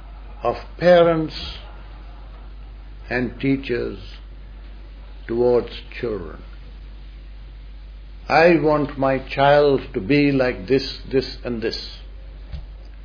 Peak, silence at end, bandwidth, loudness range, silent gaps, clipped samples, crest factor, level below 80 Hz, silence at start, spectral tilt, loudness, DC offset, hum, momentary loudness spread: -2 dBFS; 0 s; 5.4 kHz; 10 LU; none; under 0.1%; 20 dB; -36 dBFS; 0 s; -7.5 dB/octave; -20 LUFS; under 0.1%; none; 26 LU